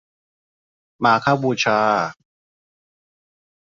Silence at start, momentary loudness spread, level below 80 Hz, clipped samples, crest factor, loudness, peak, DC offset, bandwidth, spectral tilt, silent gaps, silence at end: 1 s; 5 LU; -64 dBFS; under 0.1%; 22 dB; -19 LUFS; -2 dBFS; under 0.1%; 7.6 kHz; -5 dB/octave; none; 1.65 s